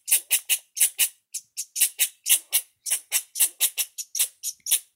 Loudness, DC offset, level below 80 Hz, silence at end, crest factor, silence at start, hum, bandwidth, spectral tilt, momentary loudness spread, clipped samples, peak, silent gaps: -23 LUFS; under 0.1%; under -90 dBFS; 0.15 s; 22 dB; 0.05 s; none; 16.5 kHz; 7 dB/octave; 10 LU; under 0.1%; -4 dBFS; none